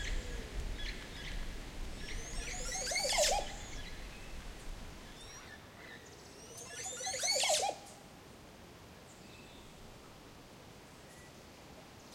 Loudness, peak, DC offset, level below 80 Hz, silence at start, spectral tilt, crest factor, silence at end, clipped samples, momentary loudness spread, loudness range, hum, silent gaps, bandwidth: -37 LUFS; -18 dBFS; under 0.1%; -48 dBFS; 0 s; -1.5 dB/octave; 22 dB; 0 s; under 0.1%; 23 LU; 17 LU; none; none; 16.5 kHz